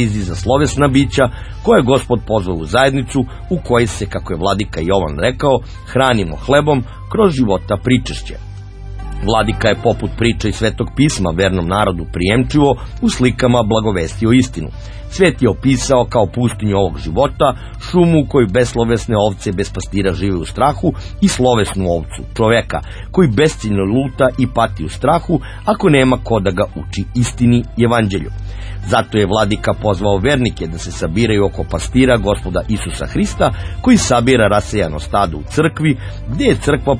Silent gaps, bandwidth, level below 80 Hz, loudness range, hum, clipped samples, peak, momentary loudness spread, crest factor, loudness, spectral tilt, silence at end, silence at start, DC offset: none; 10.5 kHz; -28 dBFS; 2 LU; none; under 0.1%; 0 dBFS; 9 LU; 14 dB; -15 LUFS; -6 dB/octave; 0 s; 0 s; under 0.1%